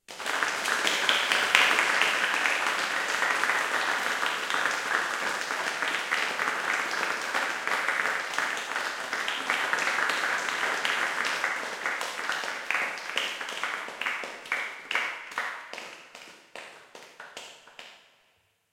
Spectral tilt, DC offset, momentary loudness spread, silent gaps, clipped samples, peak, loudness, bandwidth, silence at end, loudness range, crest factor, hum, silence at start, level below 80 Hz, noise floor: 0.5 dB/octave; under 0.1%; 19 LU; none; under 0.1%; -2 dBFS; -27 LUFS; 16.5 kHz; 0.75 s; 10 LU; 28 dB; none; 0.1 s; -80 dBFS; -69 dBFS